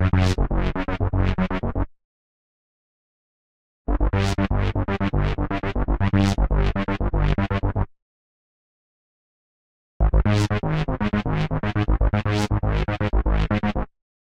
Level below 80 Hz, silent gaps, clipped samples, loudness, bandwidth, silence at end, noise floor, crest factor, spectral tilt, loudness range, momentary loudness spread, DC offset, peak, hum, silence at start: -26 dBFS; 2.04-3.85 s, 8.02-10.00 s; under 0.1%; -23 LUFS; 9.8 kHz; 0.55 s; under -90 dBFS; 16 dB; -7 dB/octave; 5 LU; 6 LU; under 0.1%; -8 dBFS; none; 0 s